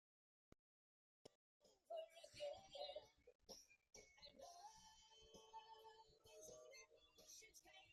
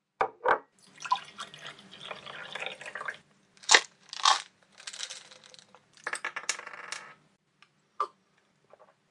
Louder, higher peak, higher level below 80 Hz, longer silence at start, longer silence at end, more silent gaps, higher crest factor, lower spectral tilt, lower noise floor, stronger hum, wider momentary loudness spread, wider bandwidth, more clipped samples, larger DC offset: second, -61 LUFS vs -30 LUFS; second, -40 dBFS vs 0 dBFS; second, -86 dBFS vs -76 dBFS; first, 1.25 s vs 0.2 s; second, 0 s vs 1.05 s; first, 1.35-1.60 s, 3.35-3.39 s vs none; second, 22 dB vs 34 dB; first, -1.5 dB/octave vs 1 dB/octave; first, under -90 dBFS vs -69 dBFS; neither; second, 12 LU vs 22 LU; first, 13.5 kHz vs 11.5 kHz; neither; neither